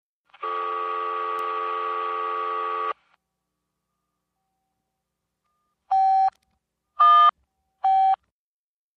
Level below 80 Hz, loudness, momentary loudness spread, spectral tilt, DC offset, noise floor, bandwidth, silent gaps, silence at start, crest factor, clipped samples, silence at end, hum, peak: -74 dBFS; -22 LUFS; 13 LU; -2.5 dB/octave; under 0.1%; -81 dBFS; 6 kHz; none; 0.4 s; 16 dB; under 0.1%; 0.8 s; 60 Hz at -80 dBFS; -8 dBFS